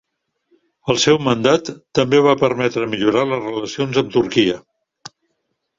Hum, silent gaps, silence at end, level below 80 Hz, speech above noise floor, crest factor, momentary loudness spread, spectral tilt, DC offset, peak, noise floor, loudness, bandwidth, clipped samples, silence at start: none; none; 1.2 s; -54 dBFS; 56 dB; 18 dB; 9 LU; -5 dB/octave; under 0.1%; 0 dBFS; -72 dBFS; -17 LUFS; 7.8 kHz; under 0.1%; 0.85 s